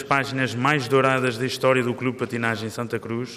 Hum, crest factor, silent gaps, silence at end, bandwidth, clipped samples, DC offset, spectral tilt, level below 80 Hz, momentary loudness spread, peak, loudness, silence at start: none; 18 dB; none; 0 s; 15.5 kHz; under 0.1%; under 0.1%; -5.5 dB/octave; -64 dBFS; 9 LU; -6 dBFS; -23 LUFS; 0 s